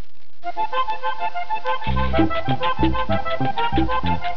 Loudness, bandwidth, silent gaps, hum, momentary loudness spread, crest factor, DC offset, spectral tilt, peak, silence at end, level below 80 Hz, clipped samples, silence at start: -23 LUFS; 5.4 kHz; none; none; 6 LU; 18 dB; 10%; -8 dB/octave; -4 dBFS; 0 s; -34 dBFS; under 0.1%; 0.45 s